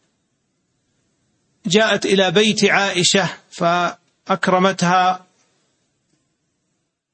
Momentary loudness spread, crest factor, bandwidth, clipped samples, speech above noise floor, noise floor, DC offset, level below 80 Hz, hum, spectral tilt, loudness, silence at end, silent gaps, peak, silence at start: 10 LU; 18 dB; 8.8 kHz; under 0.1%; 56 dB; -72 dBFS; under 0.1%; -64 dBFS; none; -3.5 dB/octave; -16 LUFS; 1.95 s; none; -2 dBFS; 1.65 s